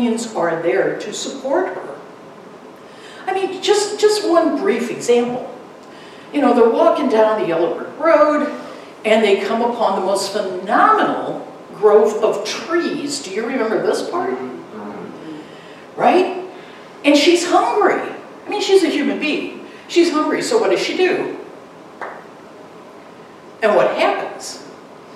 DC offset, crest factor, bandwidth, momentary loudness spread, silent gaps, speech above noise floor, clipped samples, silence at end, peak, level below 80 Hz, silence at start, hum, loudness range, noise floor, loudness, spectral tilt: under 0.1%; 16 dB; 13.5 kHz; 20 LU; none; 23 dB; under 0.1%; 0 s; 0 dBFS; -70 dBFS; 0 s; none; 6 LU; -39 dBFS; -17 LUFS; -3.5 dB/octave